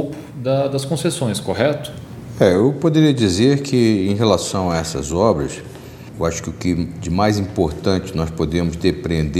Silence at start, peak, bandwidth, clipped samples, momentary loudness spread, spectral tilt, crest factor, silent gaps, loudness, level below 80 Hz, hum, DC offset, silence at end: 0 s; 0 dBFS; 16 kHz; under 0.1%; 12 LU; -6 dB/octave; 18 dB; none; -18 LUFS; -40 dBFS; none; under 0.1%; 0 s